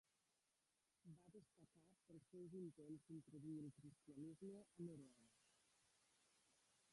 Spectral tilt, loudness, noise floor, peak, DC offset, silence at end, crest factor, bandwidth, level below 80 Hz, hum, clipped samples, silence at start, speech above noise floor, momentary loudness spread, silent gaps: -7.5 dB/octave; -60 LUFS; -89 dBFS; -46 dBFS; under 0.1%; 0 s; 16 dB; 11.5 kHz; under -90 dBFS; none; under 0.1%; 1.05 s; 30 dB; 11 LU; none